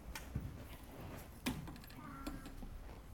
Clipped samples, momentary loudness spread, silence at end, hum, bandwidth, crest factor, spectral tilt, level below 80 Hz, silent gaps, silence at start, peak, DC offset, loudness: under 0.1%; 9 LU; 0 s; none; 19.5 kHz; 24 dB; -5 dB/octave; -54 dBFS; none; 0 s; -24 dBFS; under 0.1%; -49 LUFS